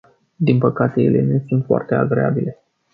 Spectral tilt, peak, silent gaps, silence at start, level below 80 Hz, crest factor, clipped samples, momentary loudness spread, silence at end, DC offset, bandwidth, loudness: -11.5 dB/octave; -2 dBFS; none; 0.4 s; -56 dBFS; 16 dB; under 0.1%; 5 LU; 0.4 s; under 0.1%; 5 kHz; -18 LUFS